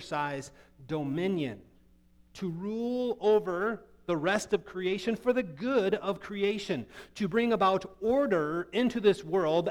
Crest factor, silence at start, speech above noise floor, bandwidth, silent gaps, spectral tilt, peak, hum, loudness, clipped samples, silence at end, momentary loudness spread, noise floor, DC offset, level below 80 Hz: 18 dB; 0 s; 31 dB; 14 kHz; none; -6 dB/octave; -12 dBFS; none; -30 LUFS; under 0.1%; 0 s; 10 LU; -61 dBFS; under 0.1%; -62 dBFS